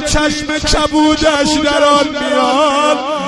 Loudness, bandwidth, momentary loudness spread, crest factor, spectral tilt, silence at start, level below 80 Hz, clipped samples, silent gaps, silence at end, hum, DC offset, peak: -12 LUFS; 12 kHz; 4 LU; 12 dB; -3.5 dB/octave; 0 s; -28 dBFS; under 0.1%; none; 0 s; none; under 0.1%; 0 dBFS